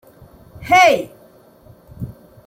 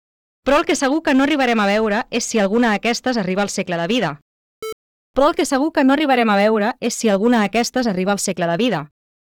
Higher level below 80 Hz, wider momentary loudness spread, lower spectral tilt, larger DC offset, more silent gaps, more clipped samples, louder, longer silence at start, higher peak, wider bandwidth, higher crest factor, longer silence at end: about the same, -48 dBFS vs -48 dBFS; first, 23 LU vs 8 LU; about the same, -3.5 dB/octave vs -4 dB/octave; neither; second, none vs 4.22-4.62 s, 4.72-5.14 s; neither; first, -13 LUFS vs -18 LUFS; first, 0.6 s vs 0.45 s; about the same, -2 dBFS vs -4 dBFS; second, 16 kHz vs 18.5 kHz; about the same, 18 dB vs 14 dB; about the same, 0.35 s vs 0.45 s